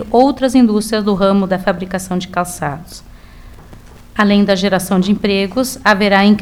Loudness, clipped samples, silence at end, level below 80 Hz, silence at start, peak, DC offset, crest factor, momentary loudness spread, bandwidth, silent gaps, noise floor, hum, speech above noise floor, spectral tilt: -14 LUFS; under 0.1%; 0 s; -40 dBFS; 0 s; 0 dBFS; 0.3%; 14 dB; 10 LU; 16 kHz; none; -37 dBFS; none; 24 dB; -5.5 dB/octave